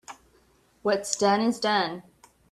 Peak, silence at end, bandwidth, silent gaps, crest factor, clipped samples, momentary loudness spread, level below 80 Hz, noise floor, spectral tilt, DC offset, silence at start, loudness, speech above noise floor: -6 dBFS; 0.5 s; 14 kHz; none; 22 dB; under 0.1%; 14 LU; -68 dBFS; -62 dBFS; -3.5 dB/octave; under 0.1%; 0.1 s; -25 LUFS; 38 dB